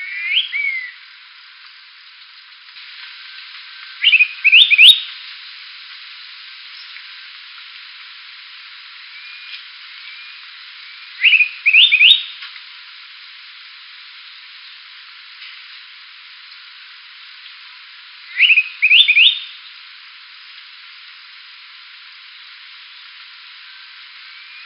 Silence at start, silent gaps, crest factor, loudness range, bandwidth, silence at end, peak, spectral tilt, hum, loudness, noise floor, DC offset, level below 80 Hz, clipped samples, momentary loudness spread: 0 s; none; 20 dB; 24 LU; 5.8 kHz; 5.15 s; 0 dBFS; 13.5 dB/octave; none; -10 LUFS; -42 dBFS; under 0.1%; under -90 dBFS; under 0.1%; 28 LU